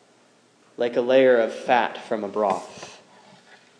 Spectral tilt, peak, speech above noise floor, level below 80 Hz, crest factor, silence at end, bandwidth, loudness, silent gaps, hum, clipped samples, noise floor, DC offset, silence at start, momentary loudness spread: -5 dB/octave; -6 dBFS; 37 dB; -82 dBFS; 18 dB; 0.85 s; 10 kHz; -22 LUFS; none; none; under 0.1%; -58 dBFS; under 0.1%; 0.8 s; 20 LU